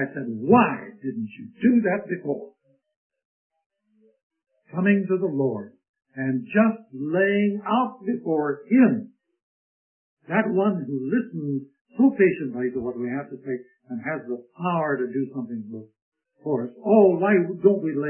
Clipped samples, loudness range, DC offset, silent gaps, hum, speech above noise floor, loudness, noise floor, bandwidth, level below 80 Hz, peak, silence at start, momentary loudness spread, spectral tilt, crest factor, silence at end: under 0.1%; 6 LU; under 0.1%; 2.96-3.10 s, 3.25-3.50 s, 3.66-3.70 s, 4.23-4.30 s, 5.89-5.94 s, 9.43-10.17 s, 11.81-11.85 s, 16.02-16.12 s; none; 40 dB; -23 LUFS; -63 dBFS; 3.2 kHz; -68 dBFS; -4 dBFS; 0 s; 15 LU; -12 dB/octave; 20 dB; 0 s